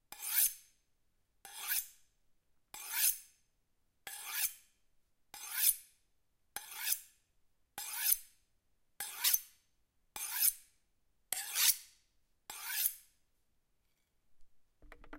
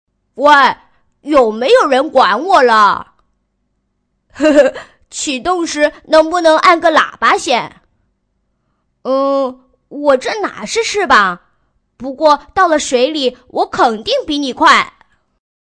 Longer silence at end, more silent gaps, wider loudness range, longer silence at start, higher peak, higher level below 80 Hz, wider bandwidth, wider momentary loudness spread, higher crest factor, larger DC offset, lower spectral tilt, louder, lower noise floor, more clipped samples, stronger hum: second, 0 s vs 0.7 s; neither; about the same, 4 LU vs 5 LU; second, 0.1 s vs 0.35 s; second, -8 dBFS vs 0 dBFS; second, -72 dBFS vs -50 dBFS; first, 16 kHz vs 10.5 kHz; first, 21 LU vs 13 LU; first, 32 dB vs 14 dB; neither; second, 3.5 dB/octave vs -2.5 dB/octave; second, -34 LUFS vs -12 LUFS; first, -77 dBFS vs -66 dBFS; neither; neither